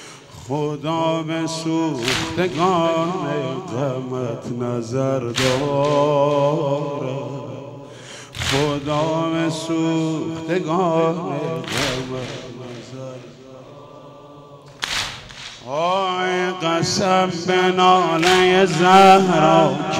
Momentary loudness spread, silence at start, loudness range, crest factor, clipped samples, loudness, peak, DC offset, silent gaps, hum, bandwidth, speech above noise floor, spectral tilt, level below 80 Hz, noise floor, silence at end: 19 LU; 0 s; 12 LU; 18 dB; under 0.1%; -19 LUFS; -2 dBFS; under 0.1%; none; none; 16 kHz; 23 dB; -5 dB/octave; -52 dBFS; -42 dBFS; 0 s